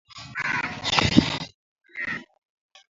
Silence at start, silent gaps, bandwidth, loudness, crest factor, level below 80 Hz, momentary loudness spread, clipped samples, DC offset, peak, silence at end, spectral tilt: 0.15 s; 1.54-1.76 s; 7.8 kHz; -24 LUFS; 26 dB; -46 dBFS; 17 LU; under 0.1%; under 0.1%; 0 dBFS; 0.65 s; -4 dB/octave